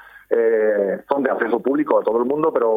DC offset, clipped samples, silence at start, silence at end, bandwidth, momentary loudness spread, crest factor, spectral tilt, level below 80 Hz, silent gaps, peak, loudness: under 0.1%; under 0.1%; 0.15 s; 0 s; 3.9 kHz; 4 LU; 18 dB; -8.5 dB/octave; -64 dBFS; none; 0 dBFS; -19 LUFS